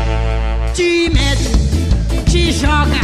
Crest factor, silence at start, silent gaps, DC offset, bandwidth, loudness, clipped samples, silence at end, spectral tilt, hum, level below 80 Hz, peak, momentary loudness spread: 12 dB; 0 s; none; under 0.1%; 12.5 kHz; -15 LUFS; under 0.1%; 0 s; -5 dB/octave; none; -16 dBFS; 0 dBFS; 5 LU